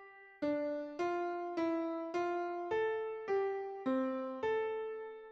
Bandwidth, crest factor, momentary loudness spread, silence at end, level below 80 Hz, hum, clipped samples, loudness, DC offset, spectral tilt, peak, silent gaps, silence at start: 7.6 kHz; 12 dB; 4 LU; 0 s; -78 dBFS; none; under 0.1%; -38 LUFS; under 0.1%; -6 dB/octave; -24 dBFS; none; 0 s